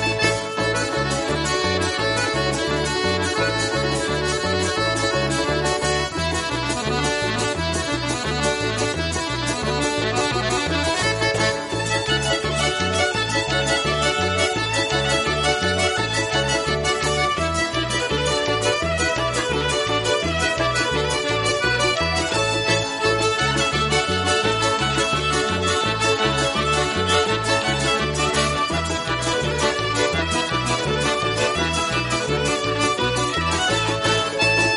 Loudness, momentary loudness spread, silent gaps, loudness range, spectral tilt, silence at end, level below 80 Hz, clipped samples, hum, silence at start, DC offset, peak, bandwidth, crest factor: -20 LUFS; 3 LU; none; 2 LU; -3.5 dB/octave; 0 s; -38 dBFS; under 0.1%; none; 0 s; under 0.1%; -4 dBFS; 11.5 kHz; 16 dB